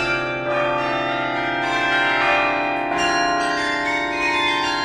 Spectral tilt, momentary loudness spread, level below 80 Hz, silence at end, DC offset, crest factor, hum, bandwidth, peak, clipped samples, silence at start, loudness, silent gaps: -3.5 dB/octave; 5 LU; -48 dBFS; 0 s; under 0.1%; 16 dB; none; 13 kHz; -4 dBFS; under 0.1%; 0 s; -19 LUFS; none